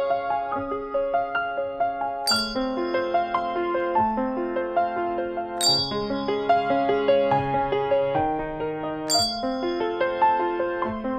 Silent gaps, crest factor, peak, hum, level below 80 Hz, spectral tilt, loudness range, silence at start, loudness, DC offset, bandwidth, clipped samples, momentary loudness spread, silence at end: none; 16 dB; -8 dBFS; none; -50 dBFS; -3.5 dB/octave; 3 LU; 0 s; -24 LUFS; under 0.1%; 15.5 kHz; under 0.1%; 7 LU; 0 s